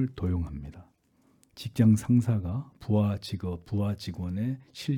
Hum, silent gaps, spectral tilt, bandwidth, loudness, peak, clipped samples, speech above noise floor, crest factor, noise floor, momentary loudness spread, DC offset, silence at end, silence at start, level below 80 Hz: none; none; -7.5 dB/octave; 14 kHz; -29 LUFS; -12 dBFS; under 0.1%; 38 dB; 16 dB; -66 dBFS; 14 LU; under 0.1%; 0 s; 0 s; -52 dBFS